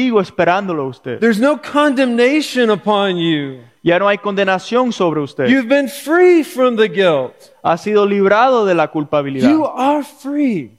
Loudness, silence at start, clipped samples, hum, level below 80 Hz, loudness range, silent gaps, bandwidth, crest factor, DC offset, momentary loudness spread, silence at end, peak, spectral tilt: -14 LUFS; 0 s; under 0.1%; none; -60 dBFS; 2 LU; none; 15.5 kHz; 14 dB; under 0.1%; 8 LU; 0.1 s; 0 dBFS; -5.5 dB/octave